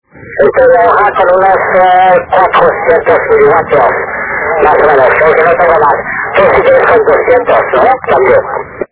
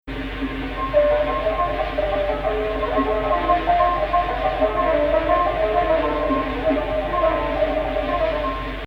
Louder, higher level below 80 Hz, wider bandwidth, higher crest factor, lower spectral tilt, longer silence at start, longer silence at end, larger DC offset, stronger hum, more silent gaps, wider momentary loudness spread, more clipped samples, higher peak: first, -7 LUFS vs -21 LUFS; about the same, -36 dBFS vs -32 dBFS; second, 4 kHz vs 6.2 kHz; second, 6 dB vs 14 dB; about the same, -8.5 dB/octave vs -7.5 dB/octave; first, 0.2 s vs 0.05 s; about the same, 0.05 s vs 0 s; neither; neither; neither; about the same, 6 LU vs 5 LU; first, 2% vs under 0.1%; first, 0 dBFS vs -6 dBFS